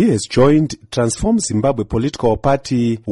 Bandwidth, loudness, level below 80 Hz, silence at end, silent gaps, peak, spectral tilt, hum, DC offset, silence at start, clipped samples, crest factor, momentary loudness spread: 11.5 kHz; -16 LUFS; -36 dBFS; 0 s; none; -4 dBFS; -6 dB/octave; none; under 0.1%; 0 s; under 0.1%; 12 dB; 6 LU